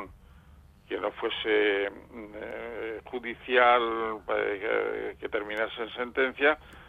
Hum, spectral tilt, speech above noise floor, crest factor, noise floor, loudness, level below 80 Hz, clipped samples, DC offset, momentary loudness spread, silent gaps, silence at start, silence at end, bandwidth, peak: none; -5.5 dB/octave; 26 dB; 22 dB; -55 dBFS; -28 LUFS; -58 dBFS; under 0.1%; under 0.1%; 15 LU; none; 0 s; 0 s; 4.8 kHz; -8 dBFS